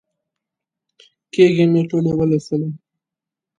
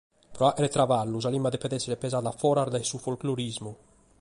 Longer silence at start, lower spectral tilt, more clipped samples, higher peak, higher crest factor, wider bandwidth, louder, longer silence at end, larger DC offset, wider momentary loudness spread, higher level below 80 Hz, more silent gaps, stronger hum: first, 1.35 s vs 0.3 s; first, -8 dB/octave vs -5.5 dB/octave; neither; first, 0 dBFS vs -10 dBFS; about the same, 18 dB vs 18 dB; second, 9.6 kHz vs 11.5 kHz; first, -17 LUFS vs -28 LUFS; first, 0.8 s vs 0.45 s; neither; first, 14 LU vs 8 LU; about the same, -56 dBFS vs -60 dBFS; neither; neither